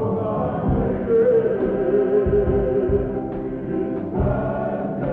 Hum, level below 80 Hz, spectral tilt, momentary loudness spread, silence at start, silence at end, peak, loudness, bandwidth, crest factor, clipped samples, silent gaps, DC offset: none; -34 dBFS; -11.5 dB/octave; 7 LU; 0 s; 0 s; -8 dBFS; -21 LUFS; 3.7 kHz; 12 dB; under 0.1%; none; under 0.1%